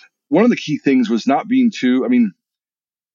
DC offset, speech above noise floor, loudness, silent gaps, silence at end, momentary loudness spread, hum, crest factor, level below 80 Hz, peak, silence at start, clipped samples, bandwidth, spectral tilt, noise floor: under 0.1%; over 75 dB; -16 LUFS; none; 0.85 s; 4 LU; none; 14 dB; -76 dBFS; -2 dBFS; 0.3 s; under 0.1%; 7.4 kHz; -6 dB/octave; under -90 dBFS